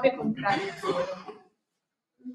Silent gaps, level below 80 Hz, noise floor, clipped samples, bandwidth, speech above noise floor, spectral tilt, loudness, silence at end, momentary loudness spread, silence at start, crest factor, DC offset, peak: none; -70 dBFS; -84 dBFS; under 0.1%; 12 kHz; 56 dB; -5.5 dB/octave; -29 LUFS; 0 s; 18 LU; 0 s; 24 dB; under 0.1%; -8 dBFS